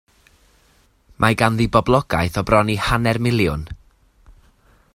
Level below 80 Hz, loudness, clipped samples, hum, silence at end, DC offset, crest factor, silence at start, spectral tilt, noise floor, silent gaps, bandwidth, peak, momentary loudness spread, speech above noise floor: -38 dBFS; -18 LUFS; under 0.1%; none; 0.65 s; under 0.1%; 20 dB; 1.2 s; -6 dB/octave; -57 dBFS; none; 16 kHz; 0 dBFS; 5 LU; 39 dB